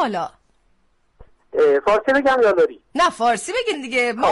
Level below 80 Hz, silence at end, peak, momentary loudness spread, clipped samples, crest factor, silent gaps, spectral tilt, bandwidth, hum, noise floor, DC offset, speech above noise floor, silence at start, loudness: -52 dBFS; 0 s; -8 dBFS; 7 LU; under 0.1%; 12 dB; none; -3 dB/octave; 11.5 kHz; none; -61 dBFS; under 0.1%; 43 dB; 0 s; -18 LUFS